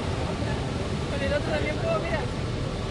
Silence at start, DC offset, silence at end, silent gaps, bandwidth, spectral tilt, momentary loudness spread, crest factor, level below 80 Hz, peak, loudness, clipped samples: 0 s; under 0.1%; 0 s; none; 11.5 kHz; -6 dB/octave; 4 LU; 14 dB; -38 dBFS; -14 dBFS; -28 LUFS; under 0.1%